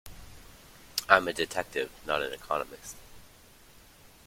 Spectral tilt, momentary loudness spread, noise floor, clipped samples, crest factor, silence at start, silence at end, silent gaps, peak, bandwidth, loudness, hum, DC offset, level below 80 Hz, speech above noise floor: -2.5 dB/octave; 26 LU; -55 dBFS; under 0.1%; 30 dB; 0.05 s; 1 s; none; -2 dBFS; 16.5 kHz; -29 LUFS; none; under 0.1%; -58 dBFS; 25 dB